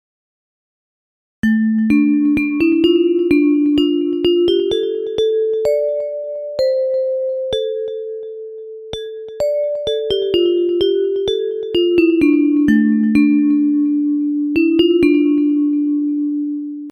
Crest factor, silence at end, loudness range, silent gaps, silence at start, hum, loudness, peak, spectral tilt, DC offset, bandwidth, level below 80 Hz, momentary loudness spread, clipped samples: 14 dB; 0 s; 7 LU; none; 1.45 s; none; -16 LUFS; -2 dBFS; -6.5 dB/octave; under 0.1%; 7.8 kHz; -48 dBFS; 11 LU; under 0.1%